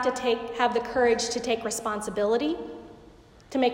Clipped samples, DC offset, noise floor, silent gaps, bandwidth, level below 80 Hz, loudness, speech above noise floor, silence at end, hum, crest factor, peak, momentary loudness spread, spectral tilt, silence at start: under 0.1%; under 0.1%; -52 dBFS; none; 16 kHz; -56 dBFS; -27 LUFS; 25 dB; 0 s; none; 16 dB; -12 dBFS; 10 LU; -3 dB/octave; 0 s